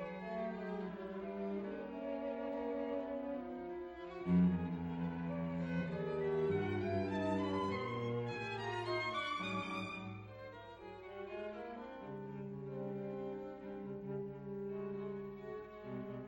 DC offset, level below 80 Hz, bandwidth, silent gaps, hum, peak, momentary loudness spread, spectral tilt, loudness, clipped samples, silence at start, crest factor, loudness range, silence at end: under 0.1%; -68 dBFS; 8.6 kHz; none; none; -24 dBFS; 11 LU; -7.5 dB/octave; -41 LUFS; under 0.1%; 0 s; 16 dB; 8 LU; 0 s